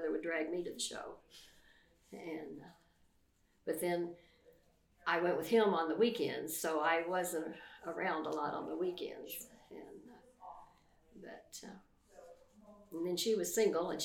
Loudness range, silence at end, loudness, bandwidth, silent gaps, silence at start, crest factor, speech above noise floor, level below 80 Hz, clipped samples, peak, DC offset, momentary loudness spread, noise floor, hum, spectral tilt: 15 LU; 0 s; -37 LUFS; 18 kHz; none; 0 s; 20 dB; 36 dB; -76 dBFS; under 0.1%; -18 dBFS; under 0.1%; 22 LU; -73 dBFS; none; -3.5 dB/octave